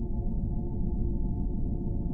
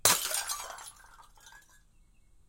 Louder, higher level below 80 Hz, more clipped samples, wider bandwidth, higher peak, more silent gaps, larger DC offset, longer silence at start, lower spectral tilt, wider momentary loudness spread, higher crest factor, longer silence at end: second, -33 LUFS vs -30 LUFS; first, -30 dBFS vs -62 dBFS; neither; second, 1.1 kHz vs 17 kHz; second, -18 dBFS vs -4 dBFS; neither; neither; about the same, 0 s vs 0.05 s; first, -14 dB/octave vs 0.5 dB/octave; second, 1 LU vs 28 LU; second, 12 dB vs 32 dB; second, 0 s vs 0.9 s